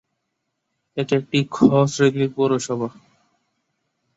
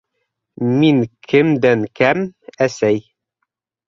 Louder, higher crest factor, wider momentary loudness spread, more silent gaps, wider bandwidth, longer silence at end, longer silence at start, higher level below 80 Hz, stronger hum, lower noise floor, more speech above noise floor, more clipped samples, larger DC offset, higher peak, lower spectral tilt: second, -20 LUFS vs -16 LUFS; about the same, 20 dB vs 16 dB; first, 12 LU vs 8 LU; neither; about the same, 8 kHz vs 7.6 kHz; first, 1.25 s vs 0.9 s; first, 0.95 s vs 0.6 s; about the same, -60 dBFS vs -58 dBFS; neither; about the same, -76 dBFS vs -75 dBFS; about the same, 57 dB vs 60 dB; neither; neither; about the same, -2 dBFS vs -2 dBFS; about the same, -6 dB/octave vs -6.5 dB/octave